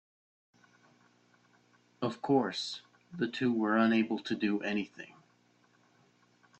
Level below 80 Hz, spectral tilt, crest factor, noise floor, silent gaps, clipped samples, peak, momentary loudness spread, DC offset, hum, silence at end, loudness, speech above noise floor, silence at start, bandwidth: -78 dBFS; -5.5 dB/octave; 18 dB; -68 dBFS; none; under 0.1%; -16 dBFS; 17 LU; under 0.1%; 60 Hz at -55 dBFS; 1.55 s; -32 LUFS; 37 dB; 2 s; 8.6 kHz